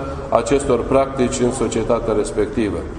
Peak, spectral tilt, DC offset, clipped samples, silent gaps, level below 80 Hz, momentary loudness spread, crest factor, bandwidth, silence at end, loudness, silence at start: 0 dBFS; -5.5 dB/octave; under 0.1%; under 0.1%; none; -34 dBFS; 4 LU; 18 dB; 11 kHz; 0 s; -19 LUFS; 0 s